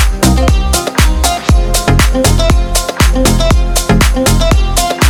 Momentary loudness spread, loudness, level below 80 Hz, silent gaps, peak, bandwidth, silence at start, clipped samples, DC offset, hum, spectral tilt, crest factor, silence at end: 3 LU; -11 LUFS; -12 dBFS; none; 0 dBFS; 19 kHz; 0 s; under 0.1%; under 0.1%; none; -4.5 dB/octave; 10 dB; 0 s